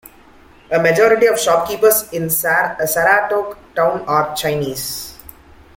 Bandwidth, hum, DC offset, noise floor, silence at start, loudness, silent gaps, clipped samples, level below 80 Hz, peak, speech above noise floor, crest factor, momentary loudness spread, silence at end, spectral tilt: 17 kHz; none; under 0.1%; -45 dBFS; 0.7 s; -16 LUFS; none; under 0.1%; -50 dBFS; 0 dBFS; 30 dB; 16 dB; 10 LU; 0.6 s; -3 dB/octave